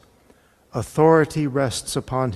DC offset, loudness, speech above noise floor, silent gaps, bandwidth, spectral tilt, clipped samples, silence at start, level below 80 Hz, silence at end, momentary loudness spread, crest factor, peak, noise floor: under 0.1%; -20 LUFS; 36 dB; none; 13.5 kHz; -5.5 dB/octave; under 0.1%; 0.75 s; -50 dBFS; 0 s; 13 LU; 18 dB; -2 dBFS; -56 dBFS